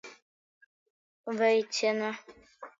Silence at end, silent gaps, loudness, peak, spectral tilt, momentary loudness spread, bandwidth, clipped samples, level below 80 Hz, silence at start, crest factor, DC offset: 0.1 s; 0.22-1.24 s; -29 LUFS; -14 dBFS; -3 dB/octave; 22 LU; 7.6 kHz; under 0.1%; -80 dBFS; 0.05 s; 18 dB; under 0.1%